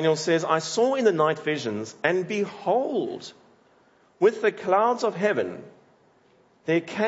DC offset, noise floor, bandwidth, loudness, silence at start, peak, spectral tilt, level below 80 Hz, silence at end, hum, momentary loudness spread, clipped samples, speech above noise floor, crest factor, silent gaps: under 0.1%; -60 dBFS; 8 kHz; -24 LUFS; 0 s; -4 dBFS; -5 dB/octave; -76 dBFS; 0 s; none; 11 LU; under 0.1%; 36 dB; 20 dB; none